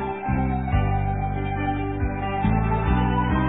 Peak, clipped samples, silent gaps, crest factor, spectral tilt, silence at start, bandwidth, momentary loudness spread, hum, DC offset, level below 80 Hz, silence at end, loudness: -8 dBFS; under 0.1%; none; 14 dB; -11.5 dB/octave; 0 s; 4 kHz; 5 LU; none; 0.2%; -28 dBFS; 0 s; -24 LUFS